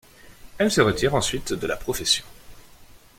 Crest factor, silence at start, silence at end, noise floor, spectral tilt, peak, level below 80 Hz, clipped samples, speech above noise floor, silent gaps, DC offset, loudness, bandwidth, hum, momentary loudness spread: 22 dB; 0.25 s; 0.2 s; -49 dBFS; -3.5 dB/octave; -4 dBFS; -44 dBFS; under 0.1%; 26 dB; none; under 0.1%; -23 LUFS; 16.5 kHz; none; 8 LU